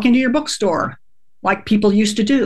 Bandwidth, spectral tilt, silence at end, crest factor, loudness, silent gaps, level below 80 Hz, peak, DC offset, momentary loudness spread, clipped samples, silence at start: 12.5 kHz; -5 dB/octave; 0 s; 14 dB; -17 LUFS; none; -48 dBFS; -2 dBFS; 1%; 8 LU; under 0.1%; 0 s